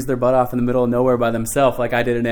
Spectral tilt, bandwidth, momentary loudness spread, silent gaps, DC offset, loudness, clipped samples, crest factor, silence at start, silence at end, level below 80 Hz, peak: -6 dB/octave; 19.5 kHz; 2 LU; none; under 0.1%; -18 LUFS; under 0.1%; 16 dB; 0 s; 0 s; -38 dBFS; -2 dBFS